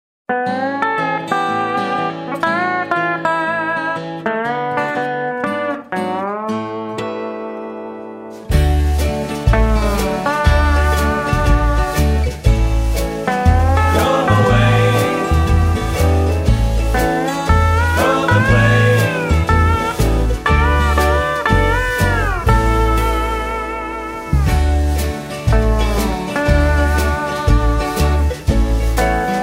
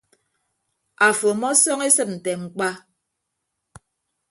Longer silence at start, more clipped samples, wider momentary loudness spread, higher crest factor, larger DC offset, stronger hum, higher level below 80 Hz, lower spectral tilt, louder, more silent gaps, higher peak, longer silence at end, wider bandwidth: second, 0.3 s vs 1 s; neither; second, 8 LU vs 11 LU; second, 14 dB vs 22 dB; neither; neither; first, -20 dBFS vs -68 dBFS; first, -6 dB/octave vs -2 dB/octave; first, -16 LUFS vs -19 LUFS; neither; about the same, 0 dBFS vs -2 dBFS; second, 0 s vs 1.5 s; first, 16 kHz vs 12 kHz